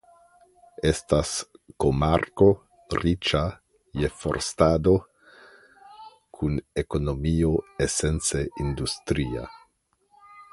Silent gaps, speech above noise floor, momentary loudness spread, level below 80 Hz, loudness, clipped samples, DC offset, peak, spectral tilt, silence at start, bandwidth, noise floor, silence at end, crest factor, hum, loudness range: none; 44 dB; 11 LU; -38 dBFS; -25 LUFS; under 0.1%; under 0.1%; -4 dBFS; -5 dB/octave; 0.8 s; 11.5 kHz; -68 dBFS; 0.1 s; 22 dB; none; 3 LU